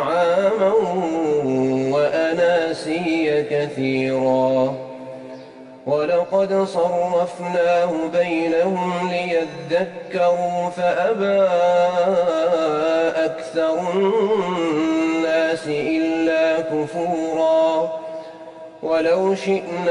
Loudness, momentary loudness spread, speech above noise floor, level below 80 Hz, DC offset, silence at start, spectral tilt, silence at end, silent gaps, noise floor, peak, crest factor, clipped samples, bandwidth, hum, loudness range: -20 LUFS; 6 LU; 20 dB; -62 dBFS; under 0.1%; 0 s; -6 dB/octave; 0 s; none; -40 dBFS; -8 dBFS; 12 dB; under 0.1%; 10.5 kHz; none; 2 LU